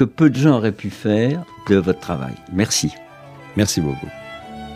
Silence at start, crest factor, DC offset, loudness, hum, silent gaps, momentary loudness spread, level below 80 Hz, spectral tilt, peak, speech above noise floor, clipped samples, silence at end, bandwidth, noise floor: 0 s; 18 dB; under 0.1%; -19 LUFS; none; none; 18 LU; -48 dBFS; -5.5 dB/octave; -2 dBFS; 22 dB; under 0.1%; 0 s; 15.5 kHz; -40 dBFS